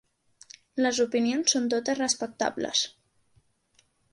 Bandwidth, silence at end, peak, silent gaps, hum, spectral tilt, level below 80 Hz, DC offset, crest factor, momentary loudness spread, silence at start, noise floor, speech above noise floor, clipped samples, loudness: 11.5 kHz; 1.25 s; -10 dBFS; none; none; -1.5 dB/octave; -70 dBFS; under 0.1%; 20 dB; 6 LU; 0.75 s; -67 dBFS; 41 dB; under 0.1%; -26 LUFS